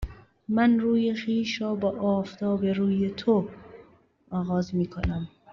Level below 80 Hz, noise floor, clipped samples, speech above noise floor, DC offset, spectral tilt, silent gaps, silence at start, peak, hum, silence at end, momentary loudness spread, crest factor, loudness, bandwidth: -46 dBFS; -58 dBFS; under 0.1%; 33 dB; under 0.1%; -6.5 dB/octave; none; 0 s; -10 dBFS; none; 0.25 s; 11 LU; 18 dB; -26 LUFS; 7 kHz